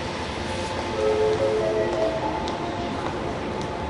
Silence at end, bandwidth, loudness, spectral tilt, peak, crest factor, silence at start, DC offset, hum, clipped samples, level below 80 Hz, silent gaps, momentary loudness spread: 0 s; 11.5 kHz; -25 LUFS; -5.5 dB/octave; -10 dBFS; 14 dB; 0 s; under 0.1%; none; under 0.1%; -42 dBFS; none; 7 LU